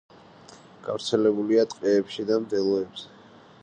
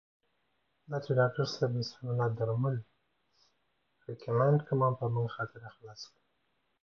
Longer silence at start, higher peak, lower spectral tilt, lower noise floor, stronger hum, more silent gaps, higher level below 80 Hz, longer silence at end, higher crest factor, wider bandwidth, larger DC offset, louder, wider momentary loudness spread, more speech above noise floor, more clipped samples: second, 0.5 s vs 0.9 s; first, -8 dBFS vs -16 dBFS; second, -5.5 dB/octave vs -7.5 dB/octave; second, -49 dBFS vs -78 dBFS; neither; neither; about the same, -70 dBFS vs -70 dBFS; second, 0.55 s vs 0.8 s; about the same, 18 dB vs 18 dB; first, 9.6 kHz vs 6.8 kHz; neither; first, -25 LUFS vs -32 LUFS; second, 15 LU vs 20 LU; second, 25 dB vs 47 dB; neither